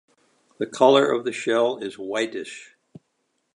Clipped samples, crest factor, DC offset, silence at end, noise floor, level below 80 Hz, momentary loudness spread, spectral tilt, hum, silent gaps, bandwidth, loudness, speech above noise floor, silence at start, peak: under 0.1%; 22 dB; under 0.1%; 0.95 s; -73 dBFS; -76 dBFS; 17 LU; -4 dB/octave; none; none; 11 kHz; -22 LUFS; 51 dB; 0.6 s; -2 dBFS